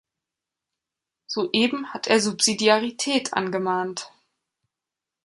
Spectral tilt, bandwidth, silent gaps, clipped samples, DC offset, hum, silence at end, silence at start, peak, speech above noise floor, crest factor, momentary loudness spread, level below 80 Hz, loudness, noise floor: -2.5 dB/octave; 11.5 kHz; none; under 0.1%; under 0.1%; none; 1.15 s; 1.3 s; -4 dBFS; 65 dB; 22 dB; 12 LU; -70 dBFS; -22 LUFS; -87 dBFS